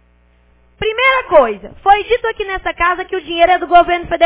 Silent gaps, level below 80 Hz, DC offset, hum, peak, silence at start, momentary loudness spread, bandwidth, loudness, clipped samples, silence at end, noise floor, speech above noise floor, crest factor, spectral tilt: none; -38 dBFS; under 0.1%; 60 Hz at -60 dBFS; 0 dBFS; 0.8 s; 10 LU; 4 kHz; -14 LUFS; under 0.1%; 0 s; -52 dBFS; 38 dB; 14 dB; -7 dB/octave